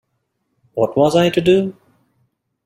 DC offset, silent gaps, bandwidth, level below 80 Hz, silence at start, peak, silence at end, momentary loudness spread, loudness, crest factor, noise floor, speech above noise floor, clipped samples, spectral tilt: under 0.1%; none; 15 kHz; -56 dBFS; 0.75 s; -2 dBFS; 0.95 s; 12 LU; -16 LUFS; 16 dB; -71 dBFS; 56 dB; under 0.1%; -6.5 dB/octave